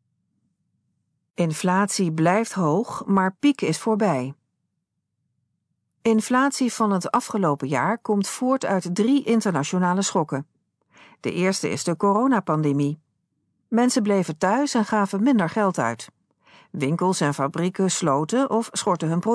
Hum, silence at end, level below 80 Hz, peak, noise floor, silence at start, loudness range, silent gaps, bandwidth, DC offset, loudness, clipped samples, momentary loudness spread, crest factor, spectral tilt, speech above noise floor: none; 0 s; -70 dBFS; -6 dBFS; -78 dBFS; 1.4 s; 3 LU; none; 11 kHz; under 0.1%; -22 LUFS; under 0.1%; 6 LU; 16 dB; -5.5 dB/octave; 57 dB